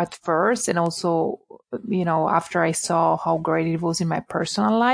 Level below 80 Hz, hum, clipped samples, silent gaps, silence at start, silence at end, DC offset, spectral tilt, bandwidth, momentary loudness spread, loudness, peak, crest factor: -62 dBFS; none; under 0.1%; none; 0 s; 0 s; under 0.1%; -5 dB/octave; 10.5 kHz; 6 LU; -22 LUFS; -6 dBFS; 16 dB